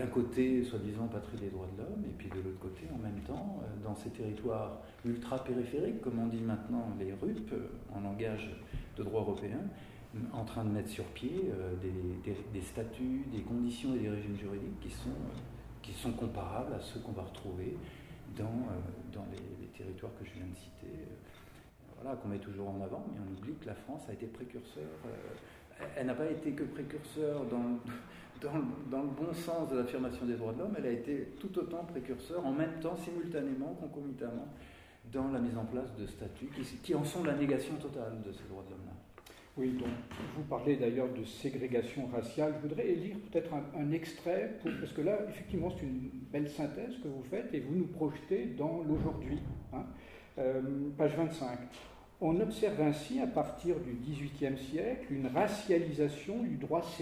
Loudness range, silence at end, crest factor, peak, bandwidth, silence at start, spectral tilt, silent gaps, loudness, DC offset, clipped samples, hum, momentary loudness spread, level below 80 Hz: 8 LU; 0 s; 20 dB; -18 dBFS; 16 kHz; 0 s; -7 dB/octave; none; -38 LUFS; under 0.1%; under 0.1%; none; 13 LU; -56 dBFS